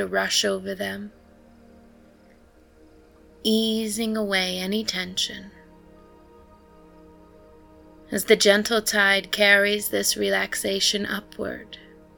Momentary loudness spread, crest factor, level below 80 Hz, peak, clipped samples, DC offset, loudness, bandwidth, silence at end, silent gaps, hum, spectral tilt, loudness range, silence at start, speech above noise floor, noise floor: 16 LU; 22 dB; -56 dBFS; -2 dBFS; under 0.1%; under 0.1%; -22 LUFS; 19 kHz; 0.35 s; none; none; -2.5 dB/octave; 12 LU; 0 s; 31 dB; -54 dBFS